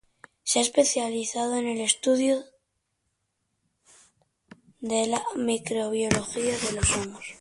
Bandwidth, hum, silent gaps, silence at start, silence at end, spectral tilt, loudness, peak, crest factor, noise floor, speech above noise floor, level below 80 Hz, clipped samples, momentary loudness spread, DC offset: 11.5 kHz; none; none; 0.45 s; 0.05 s; -3 dB/octave; -26 LUFS; -4 dBFS; 24 dB; -77 dBFS; 51 dB; -48 dBFS; under 0.1%; 6 LU; under 0.1%